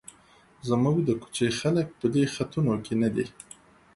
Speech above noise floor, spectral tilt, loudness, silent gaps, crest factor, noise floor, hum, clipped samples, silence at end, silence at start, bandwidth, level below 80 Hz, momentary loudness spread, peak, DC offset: 32 dB; -6.5 dB/octave; -27 LUFS; none; 16 dB; -57 dBFS; none; under 0.1%; 0.65 s; 0.65 s; 11.5 kHz; -58 dBFS; 12 LU; -12 dBFS; under 0.1%